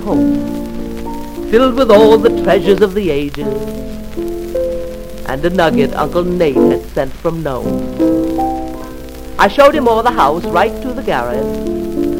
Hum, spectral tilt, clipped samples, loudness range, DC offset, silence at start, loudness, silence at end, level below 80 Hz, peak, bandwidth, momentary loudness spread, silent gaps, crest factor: none; -6 dB/octave; 0.2%; 5 LU; 0.2%; 0 s; -14 LUFS; 0 s; -30 dBFS; 0 dBFS; 16.5 kHz; 15 LU; none; 14 dB